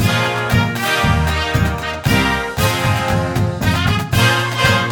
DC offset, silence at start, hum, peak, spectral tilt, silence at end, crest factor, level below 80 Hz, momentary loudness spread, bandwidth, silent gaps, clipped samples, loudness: under 0.1%; 0 s; none; 0 dBFS; -5 dB/octave; 0 s; 16 dB; -28 dBFS; 3 LU; over 20 kHz; none; under 0.1%; -16 LUFS